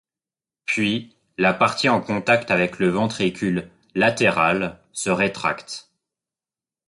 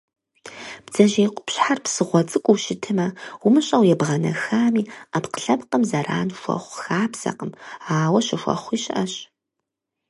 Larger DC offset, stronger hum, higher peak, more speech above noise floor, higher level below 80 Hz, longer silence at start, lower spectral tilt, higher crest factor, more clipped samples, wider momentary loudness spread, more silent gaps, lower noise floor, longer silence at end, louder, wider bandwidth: neither; neither; about the same, -4 dBFS vs -2 dBFS; first, over 69 dB vs 61 dB; first, -56 dBFS vs -66 dBFS; first, 0.7 s vs 0.45 s; about the same, -4.5 dB/octave vs -5 dB/octave; about the same, 18 dB vs 20 dB; neither; about the same, 12 LU vs 11 LU; neither; first, under -90 dBFS vs -82 dBFS; first, 1.05 s vs 0.85 s; about the same, -21 LUFS vs -21 LUFS; about the same, 11.5 kHz vs 11.5 kHz